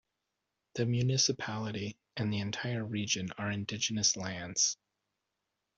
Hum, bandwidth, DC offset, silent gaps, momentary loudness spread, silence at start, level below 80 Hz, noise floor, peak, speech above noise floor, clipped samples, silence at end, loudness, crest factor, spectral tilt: none; 8 kHz; under 0.1%; none; 9 LU; 0.75 s; -68 dBFS; -86 dBFS; -16 dBFS; 52 dB; under 0.1%; 1.05 s; -32 LUFS; 20 dB; -3 dB/octave